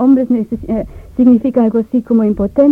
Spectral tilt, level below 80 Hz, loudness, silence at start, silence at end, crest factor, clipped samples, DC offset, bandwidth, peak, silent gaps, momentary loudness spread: -10.5 dB/octave; -36 dBFS; -13 LUFS; 0 s; 0 s; 12 dB; under 0.1%; under 0.1%; 3.3 kHz; 0 dBFS; none; 10 LU